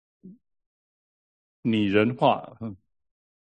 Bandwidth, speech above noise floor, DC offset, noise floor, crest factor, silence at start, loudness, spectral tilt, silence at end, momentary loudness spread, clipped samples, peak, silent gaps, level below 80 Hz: 8.6 kHz; over 66 dB; under 0.1%; under -90 dBFS; 22 dB; 0.25 s; -24 LUFS; -8 dB/octave; 0.8 s; 17 LU; under 0.1%; -6 dBFS; 0.66-1.63 s; -62 dBFS